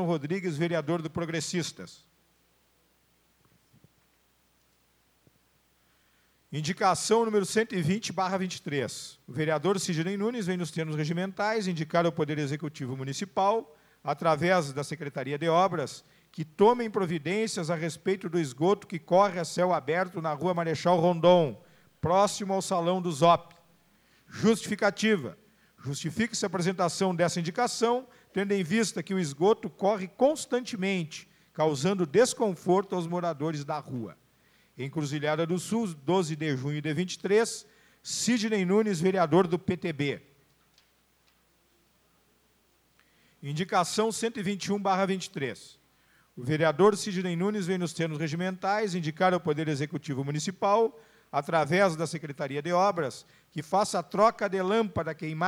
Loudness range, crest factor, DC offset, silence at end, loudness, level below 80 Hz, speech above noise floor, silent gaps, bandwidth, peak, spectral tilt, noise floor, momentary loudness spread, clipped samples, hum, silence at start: 5 LU; 22 dB; under 0.1%; 0 s; -28 LUFS; -70 dBFS; 40 dB; none; 20 kHz; -8 dBFS; -5 dB/octave; -68 dBFS; 11 LU; under 0.1%; none; 0 s